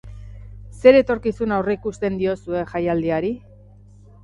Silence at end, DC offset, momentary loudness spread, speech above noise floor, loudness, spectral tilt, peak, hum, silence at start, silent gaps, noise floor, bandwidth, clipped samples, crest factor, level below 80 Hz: 0.85 s; under 0.1%; 26 LU; 27 dB; -20 LUFS; -7.5 dB/octave; 0 dBFS; 50 Hz at -40 dBFS; 0.05 s; none; -46 dBFS; 8.8 kHz; under 0.1%; 20 dB; -44 dBFS